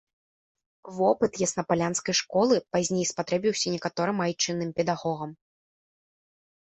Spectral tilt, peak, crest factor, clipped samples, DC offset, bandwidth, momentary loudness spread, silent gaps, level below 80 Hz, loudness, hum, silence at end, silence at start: -4 dB/octave; -10 dBFS; 18 dB; under 0.1%; under 0.1%; 8.6 kHz; 5 LU; none; -66 dBFS; -26 LUFS; none; 1.3 s; 0.85 s